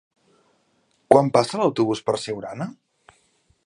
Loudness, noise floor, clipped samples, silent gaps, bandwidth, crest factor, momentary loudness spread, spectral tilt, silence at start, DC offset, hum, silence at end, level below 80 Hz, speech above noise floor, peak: -21 LUFS; -66 dBFS; under 0.1%; none; 11.5 kHz; 24 dB; 16 LU; -6 dB/octave; 1.1 s; under 0.1%; none; 0.95 s; -62 dBFS; 45 dB; 0 dBFS